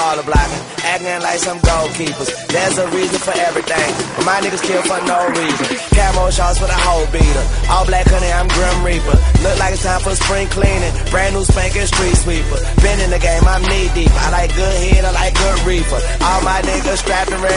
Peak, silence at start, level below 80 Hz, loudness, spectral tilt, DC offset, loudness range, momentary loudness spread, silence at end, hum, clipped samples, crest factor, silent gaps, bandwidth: 0 dBFS; 0 s; -16 dBFS; -15 LUFS; -4 dB/octave; under 0.1%; 2 LU; 4 LU; 0 s; none; under 0.1%; 14 dB; none; 11 kHz